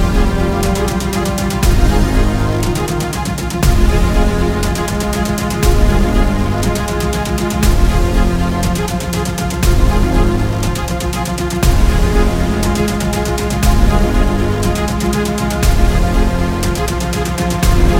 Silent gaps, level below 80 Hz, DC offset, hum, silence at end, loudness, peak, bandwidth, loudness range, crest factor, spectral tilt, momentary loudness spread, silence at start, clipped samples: none; -16 dBFS; under 0.1%; none; 0 s; -15 LUFS; 0 dBFS; 17 kHz; 1 LU; 12 dB; -5.5 dB/octave; 4 LU; 0 s; under 0.1%